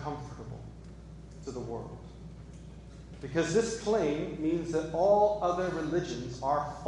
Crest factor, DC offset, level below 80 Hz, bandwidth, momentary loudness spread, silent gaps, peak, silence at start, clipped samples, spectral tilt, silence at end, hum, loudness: 18 dB; under 0.1%; -50 dBFS; 11.5 kHz; 22 LU; none; -14 dBFS; 0 s; under 0.1%; -6 dB/octave; 0 s; none; -31 LUFS